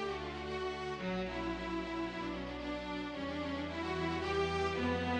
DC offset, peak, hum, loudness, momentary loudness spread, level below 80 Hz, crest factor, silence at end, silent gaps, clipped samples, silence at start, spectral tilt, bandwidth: under 0.1%; -22 dBFS; none; -38 LUFS; 6 LU; -52 dBFS; 14 dB; 0 s; none; under 0.1%; 0 s; -6 dB/octave; 10 kHz